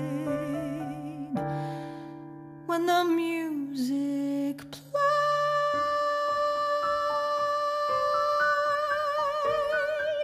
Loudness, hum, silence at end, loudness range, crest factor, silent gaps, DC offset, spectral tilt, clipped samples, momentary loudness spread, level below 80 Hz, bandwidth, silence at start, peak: -28 LUFS; none; 0 s; 4 LU; 16 dB; none; under 0.1%; -5 dB/octave; under 0.1%; 12 LU; -64 dBFS; 15 kHz; 0 s; -12 dBFS